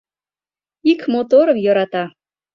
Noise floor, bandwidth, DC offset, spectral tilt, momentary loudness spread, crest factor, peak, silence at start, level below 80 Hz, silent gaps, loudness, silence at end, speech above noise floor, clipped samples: under -90 dBFS; 6.4 kHz; under 0.1%; -7 dB/octave; 10 LU; 16 dB; -2 dBFS; 0.85 s; -66 dBFS; none; -16 LUFS; 0.45 s; over 75 dB; under 0.1%